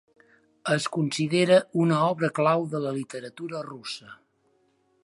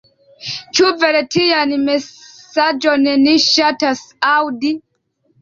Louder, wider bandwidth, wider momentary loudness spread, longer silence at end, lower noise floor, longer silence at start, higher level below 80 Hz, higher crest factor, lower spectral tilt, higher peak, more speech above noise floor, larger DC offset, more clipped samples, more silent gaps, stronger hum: second, -25 LUFS vs -14 LUFS; first, 11.5 kHz vs 7.6 kHz; first, 16 LU vs 13 LU; first, 0.9 s vs 0.6 s; first, -68 dBFS vs -63 dBFS; first, 0.65 s vs 0.4 s; second, -74 dBFS vs -60 dBFS; first, 20 dB vs 14 dB; first, -5.5 dB/octave vs -2.5 dB/octave; second, -8 dBFS vs -2 dBFS; second, 43 dB vs 49 dB; neither; neither; neither; neither